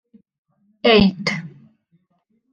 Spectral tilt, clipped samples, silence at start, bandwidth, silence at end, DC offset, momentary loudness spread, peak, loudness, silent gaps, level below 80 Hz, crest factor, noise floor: -6 dB/octave; under 0.1%; 0.85 s; 7.4 kHz; 1.05 s; under 0.1%; 17 LU; -2 dBFS; -17 LUFS; none; -46 dBFS; 20 dB; -67 dBFS